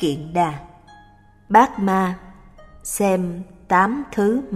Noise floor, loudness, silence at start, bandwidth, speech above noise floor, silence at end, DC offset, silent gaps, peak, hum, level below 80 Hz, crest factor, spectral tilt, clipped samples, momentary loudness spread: -50 dBFS; -20 LUFS; 0 s; 15 kHz; 31 dB; 0 s; under 0.1%; none; -2 dBFS; none; -48 dBFS; 20 dB; -5.5 dB/octave; under 0.1%; 18 LU